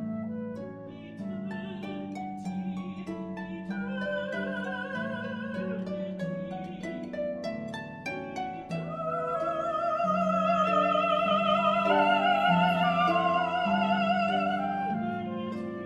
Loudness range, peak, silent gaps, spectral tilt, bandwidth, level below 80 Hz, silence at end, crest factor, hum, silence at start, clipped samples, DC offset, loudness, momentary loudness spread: 11 LU; -12 dBFS; none; -6.5 dB/octave; 11.5 kHz; -64 dBFS; 0 s; 16 dB; none; 0 s; under 0.1%; under 0.1%; -29 LUFS; 13 LU